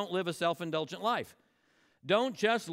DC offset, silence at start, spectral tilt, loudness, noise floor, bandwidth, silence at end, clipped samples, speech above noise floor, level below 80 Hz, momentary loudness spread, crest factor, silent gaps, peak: under 0.1%; 0 s; -4.5 dB/octave; -32 LUFS; -70 dBFS; 16 kHz; 0 s; under 0.1%; 38 dB; -80 dBFS; 8 LU; 18 dB; none; -14 dBFS